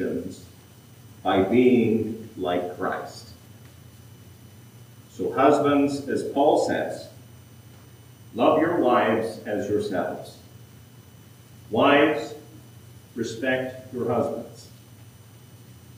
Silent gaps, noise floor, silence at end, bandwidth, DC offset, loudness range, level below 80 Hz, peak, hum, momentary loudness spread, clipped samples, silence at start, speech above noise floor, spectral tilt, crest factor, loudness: none; -49 dBFS; 0 s; 15.5 kHz; under 0.1%; 7 LU; -68 dBFS; -4 dBFS; none; 20 LU; under 0.1%; 0 s; 26 dB; -6 dB/octave; 20 dB; -23 LUFS